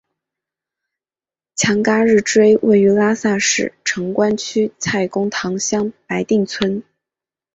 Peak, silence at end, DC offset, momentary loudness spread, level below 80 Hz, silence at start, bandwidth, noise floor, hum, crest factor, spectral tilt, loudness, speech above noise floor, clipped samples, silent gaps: -2 dBFS; 0.75 s; under 0.1%; 9 LU; -56 dBFS; 1.55 s; 8 kHz; under -90 dBFS; none; 16 dB; -4 dB/octave; -16 LUFS; over 74 dB; under 0.1%; none